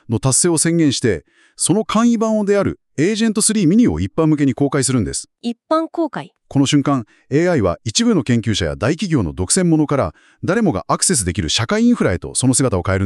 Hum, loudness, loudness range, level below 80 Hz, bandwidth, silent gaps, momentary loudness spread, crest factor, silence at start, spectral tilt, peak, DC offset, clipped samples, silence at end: none; -17 LUFS; 2 LU; -40 dBFS; 13.5 kHz; none; 8 LU; 14 dB; 0.1 s; -4.5 dB/octave; -2 dBFS; under 0.1%; under 0.1%; 0 s